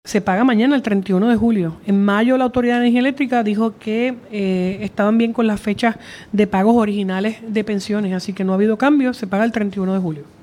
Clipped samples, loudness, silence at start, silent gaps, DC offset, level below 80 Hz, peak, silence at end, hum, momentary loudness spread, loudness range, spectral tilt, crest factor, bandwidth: under 0.1%; -18 LUFS; 0.05 s; none; under 0.1%; -52 dBFS; -2 dBFS; 0.2 s; none; 7 LU; 3 LU; -7 dB/octave; 16 dB; 12 kHz